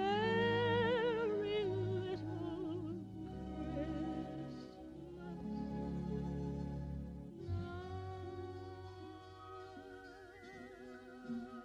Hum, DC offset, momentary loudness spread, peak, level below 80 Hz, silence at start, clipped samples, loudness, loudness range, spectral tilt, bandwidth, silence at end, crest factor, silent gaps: none; under 0.1%; 19 LU; -24 dBFS; -56 dBFS; 0 s; under 0.1%; -41 LUFS; 12 LU; -7.5 dB/octave; 10 kHz; 0 s; 16 dB; none